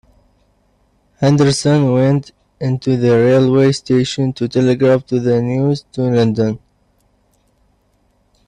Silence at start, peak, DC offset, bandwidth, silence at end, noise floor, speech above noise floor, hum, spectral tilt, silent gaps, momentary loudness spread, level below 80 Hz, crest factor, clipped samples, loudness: 1.2 s; -2 dBFS; under 0.1%; 11 kHz; 1.9 s; -59 dBFS; 45 dB; 50 Hz at -55 dBFS; -7 dB/octave; none; 8 LU; -50 dBFS; 14 dB; under 0.1%; -15 LUFS